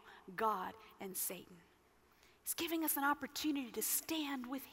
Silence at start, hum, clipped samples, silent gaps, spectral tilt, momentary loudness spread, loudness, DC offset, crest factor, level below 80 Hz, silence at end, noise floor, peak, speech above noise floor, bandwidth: 0.05 s; none; under 0.1%; none; -2 dB/octave; 12 LU; -39 LUFS; under 0.1%; 18 dB; -76 dBFS; 0 s; -70 dBFS; -24 dBFS; 30 dB; 16 kHz